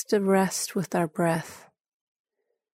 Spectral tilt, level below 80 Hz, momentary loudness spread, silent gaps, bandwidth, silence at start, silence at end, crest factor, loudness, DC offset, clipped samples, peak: -5 dB/octave; -70 dBFS; 7 LU; none; 16 kHz; 0 s; 1.15 s; 16 dB; -26 LUFS; under 0.1%; under 0.1%; -12 dBFS